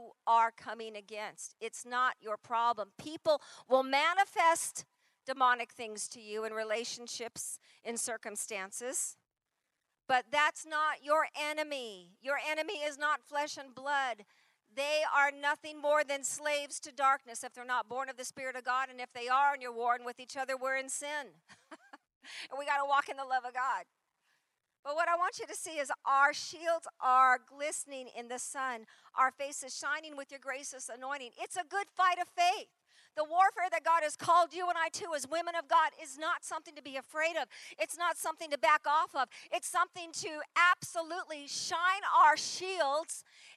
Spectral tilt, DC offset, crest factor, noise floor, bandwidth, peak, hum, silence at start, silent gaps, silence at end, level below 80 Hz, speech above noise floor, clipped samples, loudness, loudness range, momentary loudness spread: -0.5 dB/octave; under 0.1%; 20 dB; -87 dBFS; 13 kHz; -14 dBFS; none; 0 s; 22.15-22.21 s, 24.79-24.83 s; 0.05 s; under -90 dBFS; 53 dB; under 0.1%; -33 LUFS; 6 LU; 14 LU